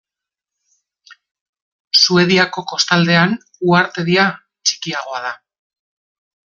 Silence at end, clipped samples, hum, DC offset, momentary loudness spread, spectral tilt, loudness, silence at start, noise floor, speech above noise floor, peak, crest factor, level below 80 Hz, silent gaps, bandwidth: 1.2 s; under 0.1%; none; under 0.1%; 12 LU; -4 dB/octave; -15 LUFS; 1.1 s; -86 dBFS; 71 dB; 0 dBFS; 18 dB; -60 dBFS; 1.31-1.35 s, 1.41-1.53 s, 1.62-1.91 s; 7.6 kHz